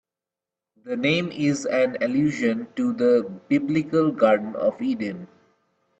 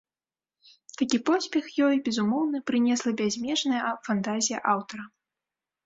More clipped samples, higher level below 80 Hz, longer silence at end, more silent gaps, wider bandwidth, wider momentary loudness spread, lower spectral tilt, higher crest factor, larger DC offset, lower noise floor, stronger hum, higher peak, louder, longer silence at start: neither; first, -66 dBFS vs -72 dBFS; about the same, 0.75 s vs 0.8 s; neither; about the same, 8.6 kHz vs 8 kHz; about the same, 7 LU vs 6 LU; first, -6 dB/octave vs -3.5 dB/octave; about the same, 18 dB vs 18 dB; neither; about the same, -89 dBFS vs under -90 dBFS; neither; first, -6 dBFS vs -10 dBFS; first, -23 LUFS vs -26 LUFS; second, 0.85 s vs 1 s